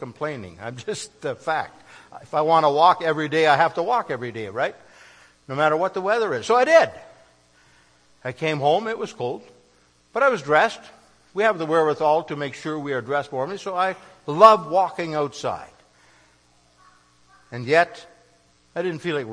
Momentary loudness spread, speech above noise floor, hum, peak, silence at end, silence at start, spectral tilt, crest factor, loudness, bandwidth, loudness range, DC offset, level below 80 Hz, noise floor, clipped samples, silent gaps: 16 LU; 38 dB; 60 Hz at -65 dBFS; 0 dBFS; 0 s; 0 s; -5 dB/octave; 22 dB; -21 LUFS; 10.5 kHz; 7 LU; under 0.1%; -66 dBFS; -59 dBFS; under 0.1%; none